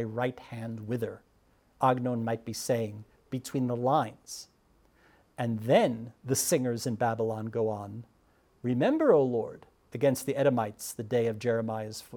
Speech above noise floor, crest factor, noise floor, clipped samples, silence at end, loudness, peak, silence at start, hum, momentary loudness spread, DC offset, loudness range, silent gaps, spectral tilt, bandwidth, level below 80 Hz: 36 dB; 20 dB; -66 dBFS; under 0.1%; 0 s; -30 LUFS; -10 dBFS; 0 s; none; 15 LU; under 0.1%; 4 LU; none; -5.5 dB/octave; 20 kHz; -68 dBFS